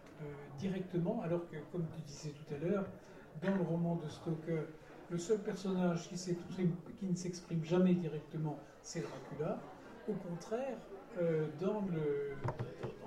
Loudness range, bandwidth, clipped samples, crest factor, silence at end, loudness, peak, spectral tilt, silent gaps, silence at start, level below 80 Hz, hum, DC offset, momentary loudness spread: 4 LU; 11.5 kHz; under 0.1%; 18 dB; 0 s; -39 LUFS; -22 dBFS; -7 dB/octave; none; 0 s; -66 dBFS; none; under 0.1%; 12 LU